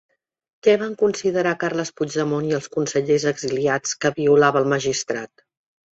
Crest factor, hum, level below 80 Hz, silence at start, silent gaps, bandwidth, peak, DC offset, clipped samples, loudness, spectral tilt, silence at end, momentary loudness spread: 18 dB; none; -62 dBFS; 0.65 s; none; 8 kHz; -4 dBFS; under 0.1%; under 0.1%; -21 LUFS; -4.5 dB/octave; 0.7 s; 8 LU